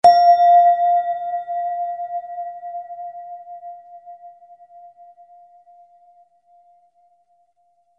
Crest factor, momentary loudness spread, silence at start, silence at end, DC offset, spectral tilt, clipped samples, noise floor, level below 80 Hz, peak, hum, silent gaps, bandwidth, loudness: 18 dB; 26 LU; 0.05 s; 3.7 s; under 0.1%; -3 dB/octave; under 0.1%; -63 dBFS; -70 dBFS; -2 dBFS; none; none; 9.4 kHz; -17 LUFS